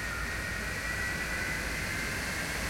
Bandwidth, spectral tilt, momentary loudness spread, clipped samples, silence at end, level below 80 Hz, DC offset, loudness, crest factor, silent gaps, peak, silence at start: 16.5 kHz; -3 dB/octave; 2 LU; under 0.1%; 0 s; -44 dBFS; under 0.1%; -33 LUFS; 12 dB; none; -22 dBFS; 0 s